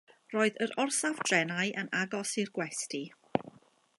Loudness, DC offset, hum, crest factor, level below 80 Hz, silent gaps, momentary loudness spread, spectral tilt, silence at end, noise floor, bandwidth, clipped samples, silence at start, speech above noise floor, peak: -32 LUFS; under 0.1%; none; 24 dB; -78 dBFS; none; 8 LU; -3 dB/octave; 0.5 s; -59 dBFS; 11.5 kHz; under 0.1%; 0.3 s; 27 dB; -10 dBFS